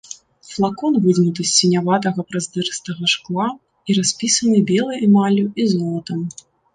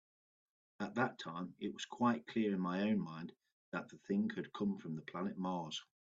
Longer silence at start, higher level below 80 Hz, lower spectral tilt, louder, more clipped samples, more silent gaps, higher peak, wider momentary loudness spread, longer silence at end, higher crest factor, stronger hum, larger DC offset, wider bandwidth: second, 0.1 s vs 0.8 s; first, -62 dBFS vs -80 dBFS; second, -4.5 dB/octave vs -6 dB/octave; first, -18 LUFS vs -40 LUFS; neither; second, none vs 3.52-3.72 s; first, -2 dBFS vs -20 dBFS; about the same, 11 LU vs 10 LU; first, 0.45 s vs 0.25 s; about the same, 16 dB vs 20 dB; neither; neither; first, 9.6 kHz vs 7.8 kHz